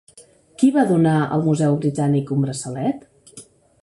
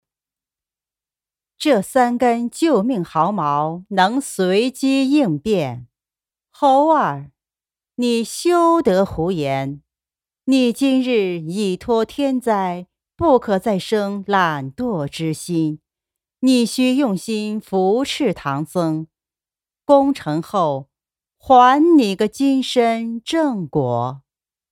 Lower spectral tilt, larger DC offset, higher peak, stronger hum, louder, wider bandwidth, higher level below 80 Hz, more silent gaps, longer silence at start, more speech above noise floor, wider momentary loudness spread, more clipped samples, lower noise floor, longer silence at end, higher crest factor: first, -7 dB/octave vs -5.5 dB/octave; neither; second, -4 dBFS vs 0 dBFS; neither; about the same, -19 LUFS vs -18 LUFS; second, 11.5 kHz vs 15.5 kHz; about the same, -58 dBFS vs -54 dBFS; neither; second, 0.15 s vs 1.6 s; second, 31 dB vs over 73 dB; about the same, 8 LU vs 9 LU; neither; second, -50 dBFS vs under -90 dBFS; second, 0.4 s vs 0.55 s; about the same, 16 dB vs 18 dB